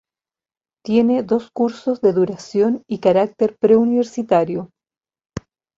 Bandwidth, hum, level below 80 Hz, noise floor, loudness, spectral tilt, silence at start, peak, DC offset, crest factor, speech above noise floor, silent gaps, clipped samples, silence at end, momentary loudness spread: 7.6 kHz; none; -56 dBFS; under -90 dBFS; -18 LUFS; -7.5 dB/octave; 0.85 s; -2 dBFS; under 0.1%; 16 dB; over 73 dB; none; under 0.1%; 0.4 s; 17 LU